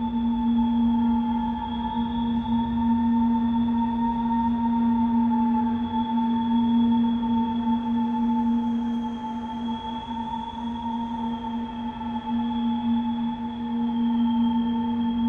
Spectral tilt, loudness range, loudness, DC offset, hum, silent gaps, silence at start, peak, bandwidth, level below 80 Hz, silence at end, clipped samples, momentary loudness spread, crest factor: -8 dB/octave; 6 LU; -25 LUFS; under 0.1%; none; none; 0 s; -14 dBFS; 3.9 kHz; -46 dBFS; 0 s; under 0.1%; 9 LU; 10 dB